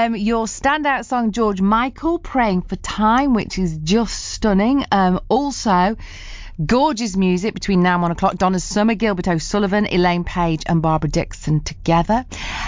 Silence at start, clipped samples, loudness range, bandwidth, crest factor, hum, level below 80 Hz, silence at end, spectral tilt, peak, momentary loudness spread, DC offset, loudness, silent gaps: 0 s; under 0.1%; 1 LU; 7.6 kHz; 14 dB; none; -34 dBFS; 0 s; -5.5 dB/octave; -4 dBFS; 6 LU; under 0.1%; -18 LUFS; none